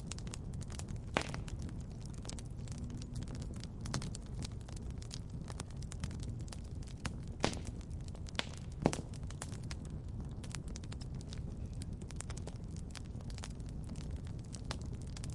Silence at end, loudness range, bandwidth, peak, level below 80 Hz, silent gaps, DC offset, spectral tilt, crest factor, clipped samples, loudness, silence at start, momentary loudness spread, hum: 0 s; 4 LU; 11.5 kHz; -8 dBFS; -48 dBFS; none; under 0.1%; -5 dB/octave; 34 dB; under 0.1%; -44 LUFS; 0 s; 8 LU; none